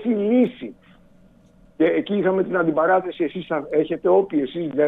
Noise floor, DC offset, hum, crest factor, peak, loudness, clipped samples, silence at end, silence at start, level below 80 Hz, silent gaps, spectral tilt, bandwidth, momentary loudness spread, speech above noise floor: -53 dBFS; under 0.1%; none; 16 dB; -6 dBFS; -21 LUFS; under 0.1%; 0 s; 0 s; -60 dBFS; none; -9 dB/octave; 4 kHz; 8 LU; 32 dB